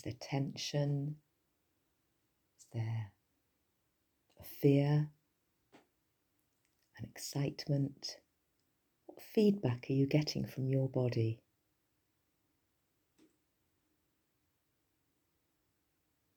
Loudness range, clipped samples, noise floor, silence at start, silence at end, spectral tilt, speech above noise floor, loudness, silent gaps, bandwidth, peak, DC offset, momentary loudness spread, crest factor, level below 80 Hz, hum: 9 LU; under 0.1%; -81 dBFS; 0.05 s; 5 s; -7 dB/octave; 46 dB; -36 LUFS; none; over 20 kHz; -16 dBFS; under 0.1%; 20 LU; 22 dB; -74 dBFS; none